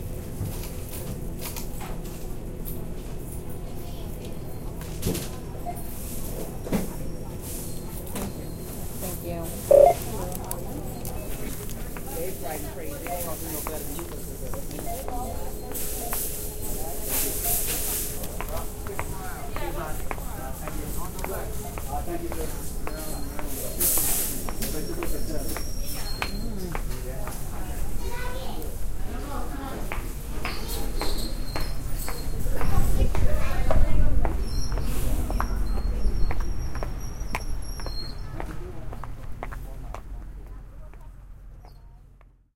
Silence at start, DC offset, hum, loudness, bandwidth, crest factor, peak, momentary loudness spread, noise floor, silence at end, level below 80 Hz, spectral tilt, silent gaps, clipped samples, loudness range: 0 s; under 0.1%; none; -30 LUFS; 17 kHz; 20 dB; -4 dBFS; 11 LU; -53 dBFS; 0.3 s; -30 dBFS; -4.5 dB/octave; none; under 0.1%; 11 LU